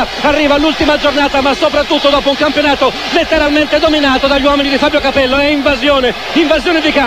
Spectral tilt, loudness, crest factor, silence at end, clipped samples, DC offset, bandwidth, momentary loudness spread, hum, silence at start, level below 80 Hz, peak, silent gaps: -4 dB/octave; -10 LUFS; 10 dB; 0 s; under 0.1%; 1%; 16 kHz; 2 LU; none; 0 s; -32 dBFS; 0 dBFS; none